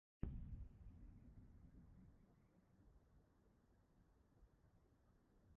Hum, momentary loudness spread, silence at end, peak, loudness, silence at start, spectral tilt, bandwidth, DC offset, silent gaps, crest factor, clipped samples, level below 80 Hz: none; 14 LU; 0 s; -30 dBFS; -60 LUFS; 0.2 s; -10 dB/octave; 3.1 kHz; under 0.1%; none; 30 dB; under 0.1%; -64 dBFS